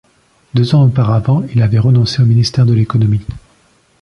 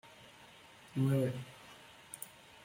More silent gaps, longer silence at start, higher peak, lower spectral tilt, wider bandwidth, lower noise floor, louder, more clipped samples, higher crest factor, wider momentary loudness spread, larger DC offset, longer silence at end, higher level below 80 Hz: neither; first, 0.55 s vs 0.05 s; first, -2 dBFS vs -22 dBFS; about the same, -7.5 dB/octave vs -6.5 dB/octave; second, 9.6 kHz vs 16.5 kHz; second, -52 dBFS vs -58 dBFS; first, -12 LUFS vs -37 LUFS; neither; second, 10 dB vs 18 dB; second, 6 LU vs 24 LU; neither; first, 0.65 s vs 0.35 s; first, -38 dBFS vs -72 dBFS